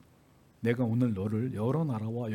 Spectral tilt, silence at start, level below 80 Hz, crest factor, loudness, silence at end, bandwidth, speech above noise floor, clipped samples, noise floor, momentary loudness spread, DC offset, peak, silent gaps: -9 dB/octave; 0.6 s; -68 dBFS; 18 dB; -31 LUFS; 0 s; 12 kHz; 32 dB; under 0.1%; -61 dBFS; 5 LU; under 0.1%; -14 dBFS; none